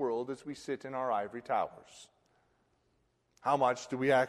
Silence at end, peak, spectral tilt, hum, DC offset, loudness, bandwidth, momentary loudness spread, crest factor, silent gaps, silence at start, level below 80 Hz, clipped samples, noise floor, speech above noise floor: 0 s; -14 dBFS; -5 dB/octave; none; under 0.1%; -34 LUFS; 12.5 kHz; 12 LU; 20 dB; none; 0 s; -76 dBFS; under 0.1%; -75 dBFS; 42 dB